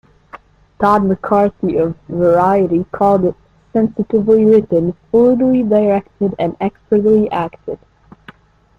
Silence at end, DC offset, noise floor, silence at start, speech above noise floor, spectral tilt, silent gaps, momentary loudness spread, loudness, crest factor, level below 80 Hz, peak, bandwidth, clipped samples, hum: 1.05 s; under 0.1%; -43 dBFS; 0.35 s; 30 dB; -9.5 dB/octave; none; 9 LU; -14 LUFS; 14 dB; -46 dBFS; -2 dBFS; 6.4 kHz; under 0.1%; none